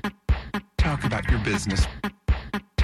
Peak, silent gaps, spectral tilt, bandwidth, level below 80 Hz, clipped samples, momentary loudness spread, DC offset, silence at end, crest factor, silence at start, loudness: -10 dBFS; none; -5.5 dB/octave; 14 kHz; -28 dBFS; under 0.1%; 6 LU; under 0.1%; 0 s; 14 dB; 0.05 s; -26 LUFS